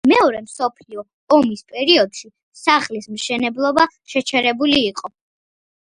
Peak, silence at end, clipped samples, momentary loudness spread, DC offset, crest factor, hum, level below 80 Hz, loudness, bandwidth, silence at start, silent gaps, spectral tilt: 0 dBFS; 0.85 s; under 0.1%; 17 LU; under 0.1%; 18 dB; none; -58 dBFS; -17 LUFS; 11.5 kHz; 0.05 s; 1.13-1.27 s, 2.43-2.52 s; -3 dB/octave